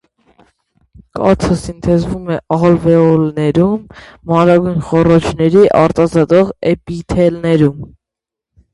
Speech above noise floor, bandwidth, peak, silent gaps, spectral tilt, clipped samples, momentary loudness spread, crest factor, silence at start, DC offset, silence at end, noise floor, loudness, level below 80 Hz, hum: 72 dB; 11.5 kHz; 0 dBFS; none; -8 dB/octave; under 0.1%; 9 LU; 12 dB; 1.15 s; under 0.1%; 0.85 s; -84 dBFS; -12 LUFS; -36 dBFS; none